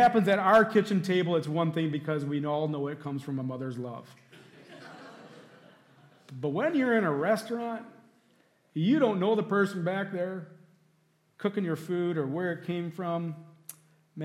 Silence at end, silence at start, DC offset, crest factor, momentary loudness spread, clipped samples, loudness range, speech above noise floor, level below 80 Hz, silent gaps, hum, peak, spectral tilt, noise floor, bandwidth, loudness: 0 s; 0 s; under 0.1%; 18 dB; 22 LU; under 0.1%; 9 LU; 41 dB; -76 dBFS; none; none; -12 dBFS; -7 dB/octave; -69 dBFS; 15.5 kHz; -29 LUFS